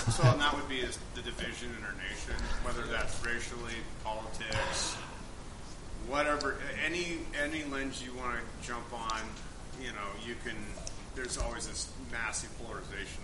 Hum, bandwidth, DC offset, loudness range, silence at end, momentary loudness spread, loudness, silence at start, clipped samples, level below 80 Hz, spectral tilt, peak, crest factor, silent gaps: none; 11.5 kHz; under 0.1%; 5 LU; 0 s; 12 LU; -36 LUFS; 0 s; under 0.1%; -44 dBFS; -4 dB/octave; -14 dBFS; 22 dB; none